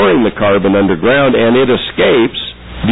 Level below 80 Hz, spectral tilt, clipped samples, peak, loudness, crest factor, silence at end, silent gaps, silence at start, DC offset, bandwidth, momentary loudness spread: -36 dBFS; -9.5 dB/octave; under 0.1%; -2 dBFS; -11 LUFS; 8 dB; 0 s; none; 0 s; 1%; 4 kHz; 8 LU